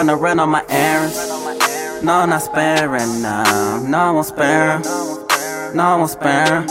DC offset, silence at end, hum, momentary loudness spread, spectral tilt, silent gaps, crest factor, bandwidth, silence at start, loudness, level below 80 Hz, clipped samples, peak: under 0.1%; 0 s; none; 6 LU; -4 dB/octave; none; 16 dB; 16.5 kHz; 0 s; -16 LUFS; -52 dBFS; under 0.1%; 0 dBFS